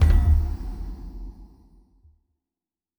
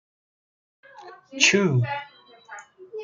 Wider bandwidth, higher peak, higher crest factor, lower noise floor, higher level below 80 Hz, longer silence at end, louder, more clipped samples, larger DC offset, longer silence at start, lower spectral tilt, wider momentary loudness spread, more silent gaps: first, 17.5 kHz vs 9.6 kHz; second, -6 dBFS vs -2 dBFS; second, 18 dB vs 24 dB; first, under -90 dBFS vs -46 dBFS; first, -26 dBFS vs -70 dBFS; first, 1.55 s vs 0 s; second, -24 LUFS vs -21 LUFS; neither; neither; second, 0 s vs 1 s; first, -8 dB/octave vs -3.5 dB/octave; second, 22 LU vs 25 LU; neither